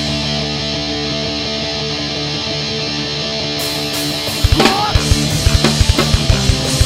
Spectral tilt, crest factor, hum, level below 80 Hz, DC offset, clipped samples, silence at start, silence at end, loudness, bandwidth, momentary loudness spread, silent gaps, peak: -4 dB/octave; 16 dB; none; -22 dBFS; under 0.1%; 0.1%; 0 s; 0 s; -15 LUFS; 16.5 kHz; 6 LU; none; 0 dBFS